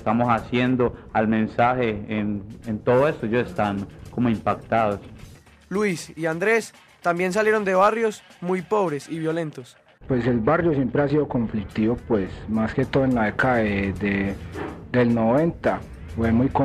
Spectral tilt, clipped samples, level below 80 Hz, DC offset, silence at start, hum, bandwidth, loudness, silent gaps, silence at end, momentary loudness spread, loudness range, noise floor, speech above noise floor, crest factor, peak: -7 dB/octave; under 0.1%; -46 dBFS; under 0.1%; 0 s; none; 14 kHz; -23 LUFS; none; 0 s; 9 LU; 2 LU; -46 dBFS; 24 dB; 16 dB; -8 dBFS